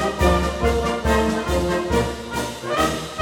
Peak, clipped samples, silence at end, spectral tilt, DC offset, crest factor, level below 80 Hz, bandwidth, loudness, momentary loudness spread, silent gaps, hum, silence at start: -4 dBFS; under 0.1%; 0 s; -5 dB/octave; under 0.1%; 16 dB; -28 dBFS; 18 kHz; -21 LUFS; 7 LU; none; none; 0 s